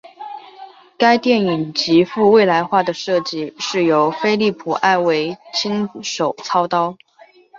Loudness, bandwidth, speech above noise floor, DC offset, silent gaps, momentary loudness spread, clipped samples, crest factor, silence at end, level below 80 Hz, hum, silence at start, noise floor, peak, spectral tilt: -17 LUFS; 7.6 kHz; 32 dB; under 0.1%; none; 10 LU; under 0.1%; 16 dB; 0 s; -62 dBFS; none; 0.05 s; -48 dBFS; -2 dBFS; -4.5 dB/octave